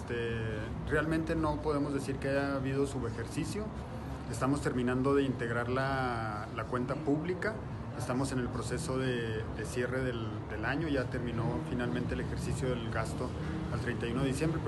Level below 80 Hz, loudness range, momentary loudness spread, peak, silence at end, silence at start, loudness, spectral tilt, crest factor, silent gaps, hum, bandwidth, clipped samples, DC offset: -46 dBFS; 2 LU; 6 LU; -18 dBFS; 0 s; 0 s; -34 LUFS; -6.5 dB/octave; 16 dB; none; none; 12 kHz; under 0.1%; under 0.1%